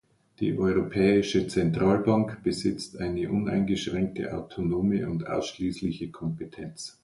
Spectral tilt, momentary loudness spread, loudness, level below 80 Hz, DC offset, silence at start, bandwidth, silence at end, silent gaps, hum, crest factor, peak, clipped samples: -6.5 dB/octave; 11 LU; -27 LUFS; -50 dBFS; under 0.1%; 0.4 s; 11.5 kHz; 0.15 s; none; none; 16 dB; -10 dBFS; under 0.1%